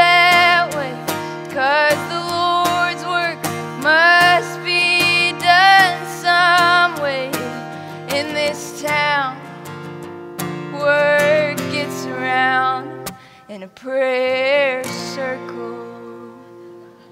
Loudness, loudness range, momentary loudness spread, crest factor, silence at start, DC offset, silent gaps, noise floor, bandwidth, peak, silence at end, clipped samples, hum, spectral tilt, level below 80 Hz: -16 LUFS; 8 LU; 20 LU; 16 dB; 0 s; under 0.1%; none; -40 dBFS; 16 kHz; -2 dBFS; 0.25 s; under 0.1%; none; -3 dB/octave; -64 dBFS